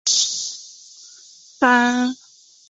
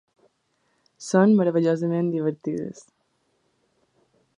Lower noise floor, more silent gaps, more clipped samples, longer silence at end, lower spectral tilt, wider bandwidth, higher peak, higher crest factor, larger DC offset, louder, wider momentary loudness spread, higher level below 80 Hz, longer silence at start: second, -47 dBFS vs -70 dBFS; neither; neither; second, 0.55 s vs 1.6 s; second, 0 dB/octave vs -7.5 dB/octave; second, 8 kHz vs 10.5 kHz; about the same, -2 dBFS vs -4 dBFS; about the same, 20 dB vs 20 dB; neither; first, -18 LUFS vs -22 LUFS; first, 23 LU vs 14 LU; about the same, -70 dBFS vs -72 dBFS; second, 0.05 s vs 1 s